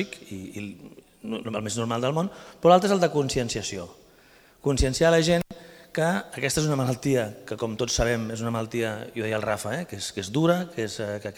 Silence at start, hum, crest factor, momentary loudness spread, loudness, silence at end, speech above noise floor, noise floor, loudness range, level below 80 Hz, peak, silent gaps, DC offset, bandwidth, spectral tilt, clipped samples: 0 s; none; 22 dB; 16 LU; -26 LUFS; 0 s; 30 dB; -55 dBFS; 4 LU; -44 dBFS; -4 dBFS; none; under 0.1%; 19.5 kHz; -5 dB/octave; under 0.1%